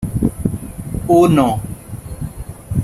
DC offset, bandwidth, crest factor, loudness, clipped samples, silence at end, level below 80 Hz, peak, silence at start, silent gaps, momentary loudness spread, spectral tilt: under 0.1%; 14 kHz; 16 dB; -16 LUFS; under 0.1%; 0 s; -32 dBFS; -2 dBFS; 0 s; none; 19 LU; -7.5 dB/octave